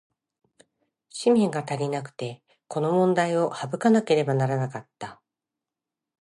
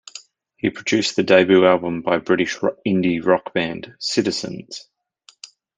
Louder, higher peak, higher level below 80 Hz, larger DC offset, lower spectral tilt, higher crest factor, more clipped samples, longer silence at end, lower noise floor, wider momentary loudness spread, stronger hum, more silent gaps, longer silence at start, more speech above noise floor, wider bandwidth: second, -24 LUFS vs -19 LUFS; second, -8 dBFS vs -2 dBFS; second, -72 dBFS vs -62 dBFS; neither; first, -6.5 dB/octave vs -5 dB/octave; about the same, 18 dB vs 18 dB; neither; about the same, 1.05 s vs 1 s; first, -88 dBFS vs -54 dBFS; about the same, 16 LU vs 17 LU; neither; neither; first, 1.15 s vs 0.15 s; first, 64 dB vs 36 dB; first, 11.5 kHz vs 9.6 kHz